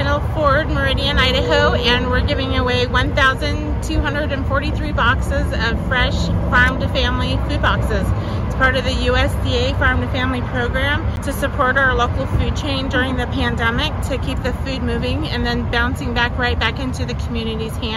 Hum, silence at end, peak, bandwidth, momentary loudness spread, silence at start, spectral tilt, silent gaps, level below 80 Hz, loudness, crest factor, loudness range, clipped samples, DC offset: none; 0 s; -2 dBFS; 13.5 kHz; 7 LU; 0 s; -5.5 dB/octave; none; -24 dBFS; -18 LUFS; 14 dB; 4 LU; under 0.1%; under 0.1%